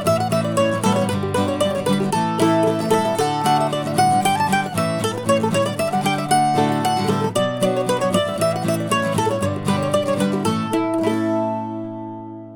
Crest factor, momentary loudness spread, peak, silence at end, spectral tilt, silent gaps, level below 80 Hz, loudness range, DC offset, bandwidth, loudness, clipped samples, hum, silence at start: 14 dB; 4 LU; -4 dBFS; 0 s; -5 dB/octave; none; -56 dBFS; 2 LU; under 0.1%; 19.5 kHz; -19 LUFS; under 0.1%; none; 0 s